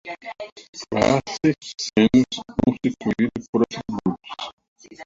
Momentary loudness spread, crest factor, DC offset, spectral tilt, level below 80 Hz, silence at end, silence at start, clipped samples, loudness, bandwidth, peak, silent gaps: 17 LU; 20 dB; under 0.1%; -5.5 dB/octave; -50 dBFS; 0 s; 0.05 s; under 0.1%; -22 LUFS; 7.8 kHz; -4 dBFS; 0.52-0.56 s, 0.69-0.73 s, 3.49-3.53 s, 4.53-4.57 s, 4.68-4.76 s